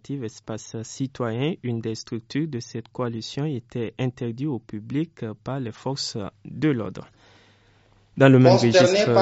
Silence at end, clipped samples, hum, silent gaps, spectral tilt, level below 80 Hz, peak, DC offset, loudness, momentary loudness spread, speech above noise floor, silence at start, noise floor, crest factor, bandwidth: 0 s; under 0.1%; none; none; -5.5 dB/octave; -62 dBFS; -2 dBFS; under 0.1%; -23 LUFS; 18 LU; 35 dB; 0.1 s; -58 dBFS; 22 dB; 8 kHz